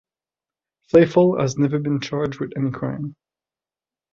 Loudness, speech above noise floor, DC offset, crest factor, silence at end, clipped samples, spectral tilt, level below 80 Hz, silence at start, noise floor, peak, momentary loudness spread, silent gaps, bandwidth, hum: -20 LUFS; over 71 dB; under 0.1%; 20 dB; 1 s; under 0.1%; -7 dB/octave; -58 dBFS; 0.95 s; under -90 dBFS; -2 dBFS; 12 LU; none; 7.4 kHz; none